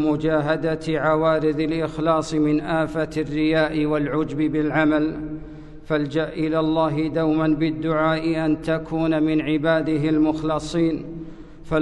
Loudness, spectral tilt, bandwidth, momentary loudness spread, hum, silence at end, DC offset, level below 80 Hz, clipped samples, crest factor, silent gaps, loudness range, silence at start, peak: -22 LUFS; -7 dB/octave; 9.8 kHz; 6 LU; none; 0 s; under 0.1%; -42 dBFS; under 0.1%; 14 dB; none; 1 LU; 0 s; -8 dBFS